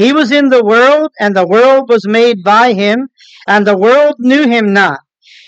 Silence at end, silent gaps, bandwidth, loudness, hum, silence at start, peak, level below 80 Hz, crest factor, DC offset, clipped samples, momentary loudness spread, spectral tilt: 0.5 s; none; 8.4 kHz; -9 LUFS; none; 0 s; 0 dBFS; -68 dBFS; 8 dB; under 0.1%; under 0.1%; 6 LU; -5.5 dB/octave